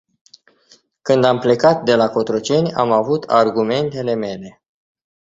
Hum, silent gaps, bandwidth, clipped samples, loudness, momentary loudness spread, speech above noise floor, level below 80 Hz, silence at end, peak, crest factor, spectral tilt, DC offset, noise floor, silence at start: none; none; 7.8 kHz; under 0.1%; -16 LUFS; 8 LU; 38 dB; -58 dBFS; 0.8 s; 0 dBFS; 16 dB; -6 dB/octave; under 0.1%; -54 dBFS; 1.05 s